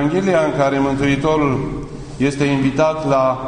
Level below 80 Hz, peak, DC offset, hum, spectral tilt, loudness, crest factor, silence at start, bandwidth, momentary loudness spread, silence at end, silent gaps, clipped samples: -38 dBFS; -2 dBFS; under 0.1%; none; -6.5 dB/octave; -17 LUFS; 14 dB; 0 s; 10 kHz; 7 LU; 0 s; none; under 0.1%